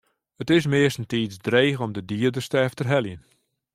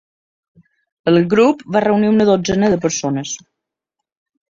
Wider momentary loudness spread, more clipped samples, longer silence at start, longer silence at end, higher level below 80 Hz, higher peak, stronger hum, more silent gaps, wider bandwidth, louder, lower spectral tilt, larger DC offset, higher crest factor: about the same, 9 LU vs 10 LU; neither; second, 0.4 s vs 1.05 s; second, 0.55 s vs 1.15 s; second, -60 dBFS vs -50 dBFS; about the same, -4 dBFS vs -2 dBFS; neither; neither; first, 15.5 kHz vs 7.6 kHz; second, -23 LUFS vs -15 LUFS; about the same, -6 dB/octave vs -5.5 dB/octave; neither; about the same, 20 dB vs 16 dB